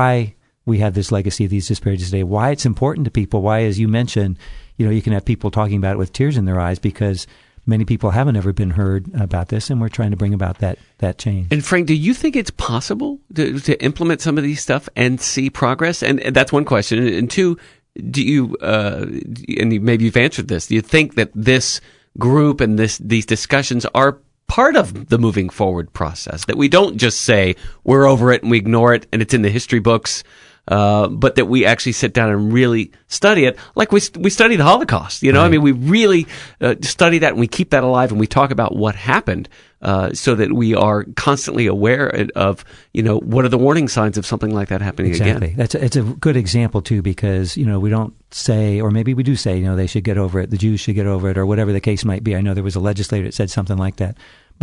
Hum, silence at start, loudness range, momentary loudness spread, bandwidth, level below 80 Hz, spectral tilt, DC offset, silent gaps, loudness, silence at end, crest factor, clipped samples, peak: none; 0 s; 5 LU; 8 LU; 11 kHz; -40 dBFS; -5.5 dB/octave; under 0.1%; none; -16 LUFS; 0.5 s; 16 dB; under 0.1%; 0 dBFS